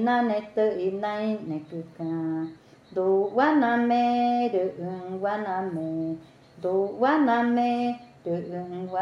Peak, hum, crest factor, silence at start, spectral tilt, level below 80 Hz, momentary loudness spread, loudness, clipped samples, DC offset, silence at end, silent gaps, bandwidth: -8 dBFS; none; 18 dB; 0 s; -7.5 dB/octave; -72 dBFS; 12 LU; -26 LUFS; under 0.1%; under 0.1%; 0 s; none; 7.2 kHz